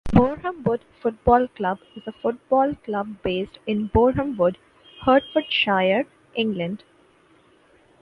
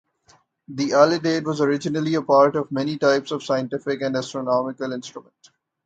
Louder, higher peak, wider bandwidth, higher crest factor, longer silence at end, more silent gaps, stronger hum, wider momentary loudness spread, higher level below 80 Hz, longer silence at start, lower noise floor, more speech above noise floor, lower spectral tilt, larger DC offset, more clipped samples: about the same, -23 LUFS vs -21 LUFS; about the same, 0 dBFS vs 0 dBFS; second, 6 kHz vs 8.8 kHz; about the same, 22 dB vs 22 dB; first, 1.25 s vs 0.65 s; neither; neither; second, 10 LU vs 13 LU; first, -42 dBFS vs -66 dBFS; second, 0.05 s vs 0.7 s; about the same, -57 dBFS vs -59 dBFS; about the same, 35 dB vs 37 dB; first, -8 dB/octave vs -5.5 dB/octave; neither; neither